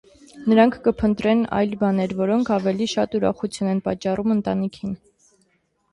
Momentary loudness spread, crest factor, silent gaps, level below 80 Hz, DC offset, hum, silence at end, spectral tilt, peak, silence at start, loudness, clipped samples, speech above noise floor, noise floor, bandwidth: 9 LU; 18 dB; none; -50 dBFS; under 0.1%; none; 0.95 s; -6.5 dB/octave; -4 dBFS; 0.35 s; -21 LUFS; under 0.1%; 46 dB; -67 dBFS; 11.5 kHz